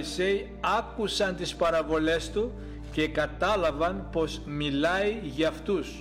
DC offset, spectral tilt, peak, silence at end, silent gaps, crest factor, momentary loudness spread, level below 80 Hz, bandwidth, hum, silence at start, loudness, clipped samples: under 0.1%; -5 dB/octave; -14 dBFS; 0 s; none; 14 dB; 6 LU; -42 dBFS; 16 kHz; none; 0 s; -28 LUFS; under 0.1%